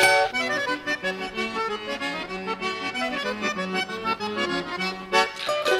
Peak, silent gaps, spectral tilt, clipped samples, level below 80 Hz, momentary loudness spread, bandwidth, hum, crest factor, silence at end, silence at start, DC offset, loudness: -6 dBFS; none; -3 dB/octave; under 0.1%; -58 dBFS; 6 LU; 16 kHz; none; 20 dB; 0 s; 0 s; under 0.1%; -26 LUFS